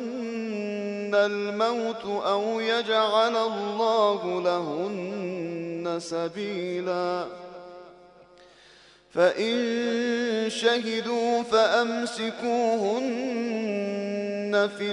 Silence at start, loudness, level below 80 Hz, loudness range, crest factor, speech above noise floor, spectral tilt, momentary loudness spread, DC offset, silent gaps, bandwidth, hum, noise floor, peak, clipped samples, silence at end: 0 s; -26 LUFS; -72 dBFS; 7 LU; 18 dB; 29 dB; -4.5 dB/octave; 9 LU; under 0.1%; none; 11 kHz; none; -54 dBFS; -8 dBFS; under 0.1%; 0 s